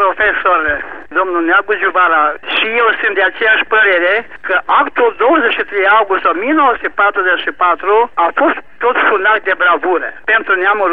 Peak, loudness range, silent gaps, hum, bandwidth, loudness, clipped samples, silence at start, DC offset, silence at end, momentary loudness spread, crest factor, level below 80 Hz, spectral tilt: -2 dBFS; 1 LU; none; none; 4.9 kHz; -12 LUFS; under 0.1%; 0 s; 2%; 0 s; 5 LU; 12 dB; -48 dBFS; -5.5 dB/octave